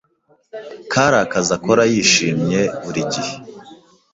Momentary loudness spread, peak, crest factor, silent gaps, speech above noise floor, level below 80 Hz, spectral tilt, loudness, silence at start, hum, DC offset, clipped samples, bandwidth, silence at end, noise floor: 21 LU; 0 dBFS; 18 dB; none; 28 dB; -52 dBFS; -3.5 dB/octave; -16 LUFS; 0.55 s; none; under 0.1%; under 0.1%; 8 kHz; 0.4 s; -45 dBFS